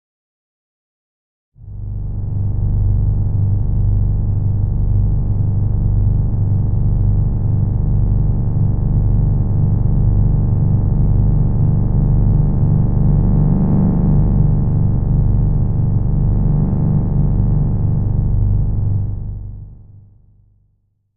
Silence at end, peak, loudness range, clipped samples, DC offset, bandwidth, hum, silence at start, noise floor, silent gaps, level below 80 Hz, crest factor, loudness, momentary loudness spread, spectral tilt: 0 s; -2 dBFS; 5 LU; under 0.1%; 4%; 1.9 kHz; 50 Hz at -20 dBFS; 1.5 s; -62 dBFS; none; -20 dBFS; 12 dB; -17 LUFS; 4 LU; -15.5 dB/octave